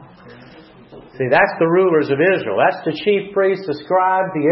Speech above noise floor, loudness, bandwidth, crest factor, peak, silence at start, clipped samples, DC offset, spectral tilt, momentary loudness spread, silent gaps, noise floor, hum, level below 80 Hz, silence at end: 26 dB; -17 LUFS; 5.8 kHz; 16 dB; -2 dBFS; 0 s; under 0.1%; under 0.1%; -10 dB/octave; 5 LU; none; -43 dBFS; none; -60 dBFS; 0 s